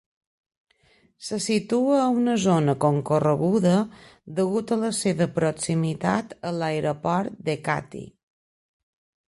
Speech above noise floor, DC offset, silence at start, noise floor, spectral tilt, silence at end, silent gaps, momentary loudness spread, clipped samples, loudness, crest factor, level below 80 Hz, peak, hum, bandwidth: 38 dB; under 0.1%; 1.2 s; -62 dBFS; -6 dB/octave; 1.2 s; none; 9 LU; under 0.1%; -24 LUFS; 18 dB; -62 dBFS; -8 dBFS; none; 11.5 kHz